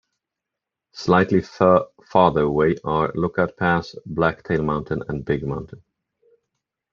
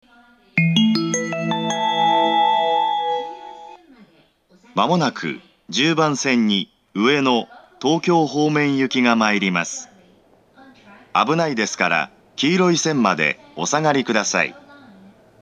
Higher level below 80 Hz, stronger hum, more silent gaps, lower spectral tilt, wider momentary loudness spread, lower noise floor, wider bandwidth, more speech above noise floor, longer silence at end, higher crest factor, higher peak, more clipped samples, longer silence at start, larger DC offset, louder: first, -48 dBFS vs -70 dBFS; neither; neither; first, -7.5 dB/octave vs -4 dB/octave; about the same, 10 LU vs 10 LU; first, -85 dBFS vs -56 dBFS; second, 7.2 kHz vs 10 kHz; first, 65 dB vs 37 dB; first, 1.15 s vs 0.85 s; about the same, 20 dB vs 20 dB; about the same, -2 dBFS vs 0 dBFS; neither; first, 0.95 s vs 0.55 s; neither; about the same, -21 LUFS vs -19 LUFS